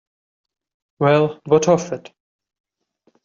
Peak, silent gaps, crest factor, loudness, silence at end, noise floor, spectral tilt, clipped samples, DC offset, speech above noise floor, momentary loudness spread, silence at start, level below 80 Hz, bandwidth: -2 dBFS; none; 18 dB; -17 LUFS; 1.25 s; -65 dBFS; -6 dB/octave; under 0.1%; under 0.1%; 48 dB; 13 LU; 1 s; -62 dBFS; 7.6 kHz